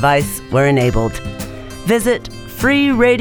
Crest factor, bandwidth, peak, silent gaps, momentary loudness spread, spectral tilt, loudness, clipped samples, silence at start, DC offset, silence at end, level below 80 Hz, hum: 14 dB; over 20 kHz; -2 dBFS; none; 15 LU; -5.5 dB/octave; -15 LUFS; under 0.1%; 0 s; under 0.1%; 0 s; -32 dBFS; none